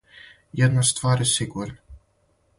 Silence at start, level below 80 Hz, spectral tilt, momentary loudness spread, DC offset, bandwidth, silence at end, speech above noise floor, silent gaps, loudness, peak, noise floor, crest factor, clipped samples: 0.55 s; -50 dBFS; -4 dB/octave; 16 LU; under 0.1%; 11.5 kHz; 0.6 s; 44 dB; none; -21 LUFS; -8 dBFS; -65 dBFS; 18 dB; under 0.1%